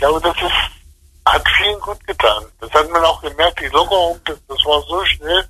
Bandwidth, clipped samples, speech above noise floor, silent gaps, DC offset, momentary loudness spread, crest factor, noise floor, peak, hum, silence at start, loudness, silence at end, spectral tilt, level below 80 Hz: 13 kHz; under 0.1%; 29 dB; none; under 0.1%; 9 LU; 16 dB; -45 dBFS; 0 dBFS; none; 0 s; -15 LUFS; 0 s; -3 dB/octave; -34 dBFS